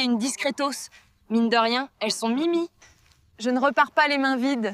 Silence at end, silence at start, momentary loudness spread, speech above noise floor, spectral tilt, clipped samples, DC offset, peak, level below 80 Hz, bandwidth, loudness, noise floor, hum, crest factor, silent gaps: 0 s; 0 s; 8 LU; 35 dB; -3 dB/octave; under 0.1%; under 0.1%; -6 dBFS; -70 dBFS; 15 kHz; -23 LUFS; -58 dBFS; none; 18 dB; none